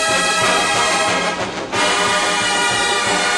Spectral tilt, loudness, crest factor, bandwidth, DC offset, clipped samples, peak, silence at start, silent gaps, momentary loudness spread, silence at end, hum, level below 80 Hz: -1.5 dB/octave; -15 LUFS; 12 dB; 16 kHz; under 0.1%; under 0.1%; -4 dBFS; 0 s; none; 4 LU; 0 s; none; -48 dBFS